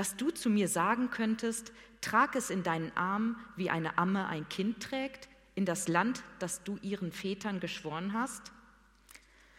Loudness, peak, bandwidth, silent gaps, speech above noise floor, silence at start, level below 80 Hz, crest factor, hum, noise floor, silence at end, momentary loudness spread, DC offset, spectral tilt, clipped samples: -34 LUFS; -12 dBFS; 16.5 kHz; none; 28 dB; 0 s; -66 dBFS; 22 dB; none; -62 dBFS; 0.4 s; 9 LU; under 0.1%; -4.5 dB/octave; under 0.1%